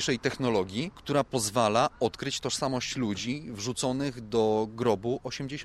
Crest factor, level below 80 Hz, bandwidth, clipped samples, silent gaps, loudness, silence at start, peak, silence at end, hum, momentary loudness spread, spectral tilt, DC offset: 20 dB; -56 dBFS; 15 kHz; under 0.1%; none; -29 LUFS; 0 s; -10 dBFS; 0 s; none; 8 LU; -4.5 dB/octave; under 0.1%